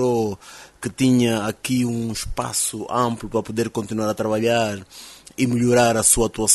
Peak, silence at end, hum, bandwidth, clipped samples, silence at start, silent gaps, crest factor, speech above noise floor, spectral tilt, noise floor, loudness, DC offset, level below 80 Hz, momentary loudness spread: -2 dBFS; 0 s; none; 12.5 kHz; under 0.1%; 0 s; none; 20 dB; 20 dB; -4 dB/octave; -41 dBFS; -20 LUFS; under 0.1%; -42 dBFS; 16 LU